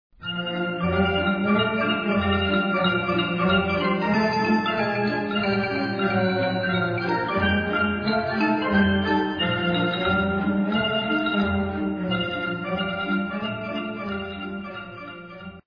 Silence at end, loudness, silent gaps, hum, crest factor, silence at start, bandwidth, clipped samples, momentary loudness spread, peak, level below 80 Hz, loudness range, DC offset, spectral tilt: 0.05 s; -23 LUFS; none; none; 16 dB; 0.2 s; 5.2 kHz; under 0.1%; 9 LU; -8 dBFS; -48 dBFS; 4 LU; under 0.1%; -7.5 dB/octave